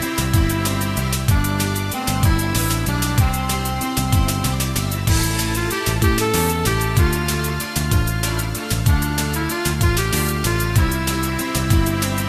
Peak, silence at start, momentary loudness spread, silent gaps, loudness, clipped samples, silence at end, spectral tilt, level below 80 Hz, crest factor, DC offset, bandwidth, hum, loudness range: -4 dBFS; 0 s; 4 LU; none; -19 LUFS; under 0.1%; 0 s; -4.5 dB/octave; -26 dBFS; 16 dB; under 0.1%; 14.5 kHz; none; 1 LU